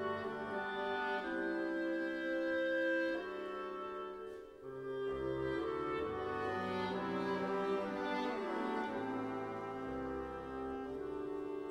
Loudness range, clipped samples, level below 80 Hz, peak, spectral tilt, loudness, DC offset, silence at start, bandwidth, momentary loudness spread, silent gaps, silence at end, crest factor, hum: 4 LU; under 0.1%; -64 dBFS; -26 dBFS; -6.5 dB/octave; -39 LUFS; under 0.1%; 0 s; 11.5 kHz; 7 LU; none; 0 s; 14 dB; none